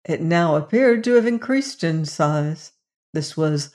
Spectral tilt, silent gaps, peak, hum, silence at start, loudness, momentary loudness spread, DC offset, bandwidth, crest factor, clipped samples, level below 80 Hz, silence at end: -6 dB/octave; 2.96-3.13 s; -4 dBFS; none; 0.1 s; -20 LUFS; 11 LU; under 0.1%; 11 kHz; 16 dB; under 0.1%; -68 dBFS; 0.05 s